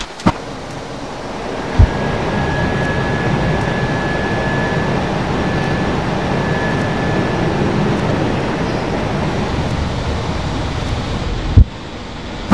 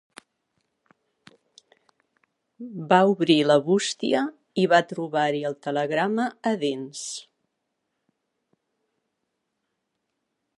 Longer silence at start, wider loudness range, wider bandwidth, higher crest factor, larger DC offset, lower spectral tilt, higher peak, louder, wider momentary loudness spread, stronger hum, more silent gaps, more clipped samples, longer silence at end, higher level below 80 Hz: second, 0 s vs 2.6 s; second, 2 LU vs 12 LU; about the same, 11 kHz vs 11.5 kHz; second, 16 dB vs 24 dB; first, 2% vs under 0.1%; first, -6.5 dB/octave vs -4.5 dB/octave; first, 0 dBFS vs -4 dBFS; first, -18 LUFS vs -23 LUFS; second, 11 LU vs 15 LU; neither; neither; neither; second, 0 s vs 3.35 s; first, -24 dBFS vs -80 dBFS